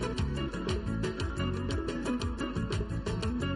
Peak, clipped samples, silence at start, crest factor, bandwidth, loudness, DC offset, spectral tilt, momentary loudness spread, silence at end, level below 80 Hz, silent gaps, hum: -20 dBFS; under 0.1%; 0 s; 12 dB; 11.5 kHz; -34 LUFS; under 0.1%; -6 dB/octave; 1 LU; 0 s; -40 dBFS; none; none